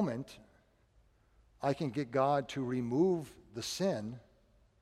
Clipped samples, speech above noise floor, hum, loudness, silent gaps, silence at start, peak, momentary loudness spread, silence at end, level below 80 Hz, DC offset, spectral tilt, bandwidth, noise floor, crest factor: under 0.1%; 34 dB; none; -34 LUFS; none; 0 s; -18 dBFS; 15 LU; 0.6 s; -68 dBFS; under 0.1%; -6 dB/octave; 15 kHz; -68 dBFS; 18 dB